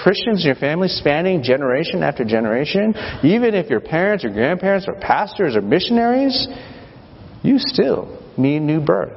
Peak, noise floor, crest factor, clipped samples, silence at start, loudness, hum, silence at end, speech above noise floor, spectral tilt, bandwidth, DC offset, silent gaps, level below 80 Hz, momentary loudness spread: 0 dBFS; -40 dBFS; 18 dB; under 0.1%; 0 s; -18 LUFS; none; 0 s; 23 dB; -9 dB/octave; 6 kHz; under 0.1%; none; -48 dBFS; 5 LU